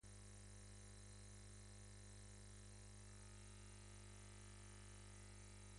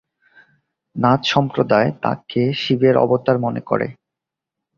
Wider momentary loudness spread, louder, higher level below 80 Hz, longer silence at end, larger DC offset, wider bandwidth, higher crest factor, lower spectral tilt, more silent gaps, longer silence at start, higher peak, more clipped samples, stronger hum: second, 0 LU vs 7 LU; second, -61 LUFS vs -18 LUFS; second, -64 dBFS vs -56 dBFS; second, 0 s vs 0.85 s; neither; first, 11.5 kHz vs 7.4 kHz; second, 12 dB vs 18 dB; second, -4 dB/octave vs -7 dB/octave; neither; second, 0.05 s vs 0.95 s; second, -48 dBFS vs -2 dBFS; neither; first, 50 Hz at -60 dBFS vs none